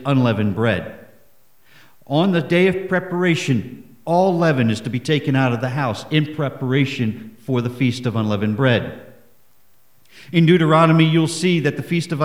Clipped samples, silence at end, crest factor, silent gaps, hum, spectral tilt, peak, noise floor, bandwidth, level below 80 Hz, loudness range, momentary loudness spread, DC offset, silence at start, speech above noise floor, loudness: under 0.1%; 0 s; 16 dB; none; none; -6.5 dB/octave; -2 dBFS; -60 dBFS; 14 kHz; -58 dBFS; 4 LU; 10 LU; 0.4%; 0 s; 42 dB; -18 LUFS